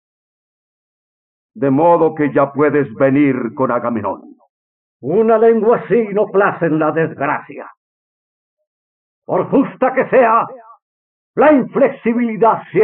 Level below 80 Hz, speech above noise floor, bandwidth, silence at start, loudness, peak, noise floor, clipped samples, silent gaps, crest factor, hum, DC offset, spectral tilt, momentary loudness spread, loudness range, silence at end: -62 dBFS; over 76 dB; 3.8 kHz; 1.55 s; -14 LUFS; -2 dBFS; under -90 dBFS; under 0.1%; 4.49-5.00 s, 7.77-8.57 s, 8.67-9.22 s, 10.82-11.34 s; 14 dB; none; under 0.1%; -7 dB/octave; 10 LU; 4 LU; 0 s